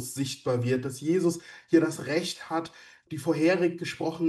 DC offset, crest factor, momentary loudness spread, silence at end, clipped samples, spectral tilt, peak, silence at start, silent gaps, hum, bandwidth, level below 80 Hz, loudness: under 0.1%; 18 dB; 9 LU; 0 s; under 0.1%; -5.5 dB/octave; -10 dBFS; 0 s; none; none; 12.5 kHz; -70 dBFS; -28 LUFS